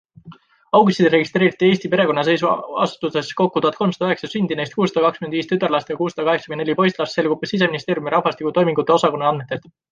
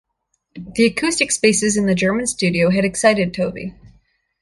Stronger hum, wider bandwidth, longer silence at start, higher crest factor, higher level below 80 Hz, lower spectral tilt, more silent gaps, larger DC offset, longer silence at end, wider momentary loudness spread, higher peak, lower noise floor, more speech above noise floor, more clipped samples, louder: neither; second, 9 kHz vs 11.5 kHz; second, 0.25 s vs 0.55 s; about the same, 18 dB vs 18 dB; second, -62 dBFS vs -48 dBFS; first, -6 dB/octave vs -4 dB/octave; neither; neither; second, 0.35 s vs 0.55 s; second, 7 LU vs 12 LU; about the same, -2 dBFS vs -2 dBFS; second, -44 dBFS vs -71 dBFS; second, 26 dB vs 54 dB; neither; about the same, -19 LUFS vs -17 LUFS